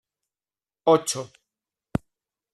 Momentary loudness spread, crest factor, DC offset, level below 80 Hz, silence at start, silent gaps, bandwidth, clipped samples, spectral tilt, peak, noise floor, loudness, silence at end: 12 LU; 22 dB; under 0.1%; -54 dBFS; 0.85 s; none; 13 kHz; under 0.1%; -4.5 dB/octave; -6 dBFS; under -90 dBFS; -25 LUFS; 1.3 s